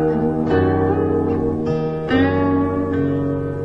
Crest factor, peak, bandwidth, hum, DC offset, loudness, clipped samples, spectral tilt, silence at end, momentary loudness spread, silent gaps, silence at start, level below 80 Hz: 14 dB; -4 dBFS; 6 kHz; none; 0.3%; -19 LUFS; under 0.1%; -9.5 dB/octave; 0 s; 4 LU; none; 0 s; -40 dBFS